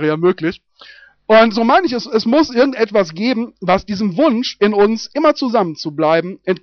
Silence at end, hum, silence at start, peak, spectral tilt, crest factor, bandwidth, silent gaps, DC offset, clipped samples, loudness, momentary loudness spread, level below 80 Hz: 0.05 s; none; 0 s; -2 dBFS; -4 dB/octave; 14 dB; 6.6 kHz; none; under 0.1%; under 0.1%; -15 LUFS; 9 LU; -50 dBFS